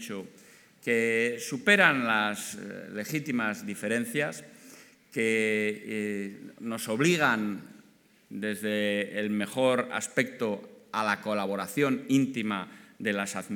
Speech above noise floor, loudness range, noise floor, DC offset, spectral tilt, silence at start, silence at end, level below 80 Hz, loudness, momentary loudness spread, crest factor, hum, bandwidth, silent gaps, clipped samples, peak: 32 dB; 4 LU; -61 dBFS; under 0.1%; -4.5 dB/octave; 0 s; 0 s; -84 dBFS; -28 LUFS; 14 LU; 24 dB; none; 19 kHz; none; under 0.1%; -6 dBFS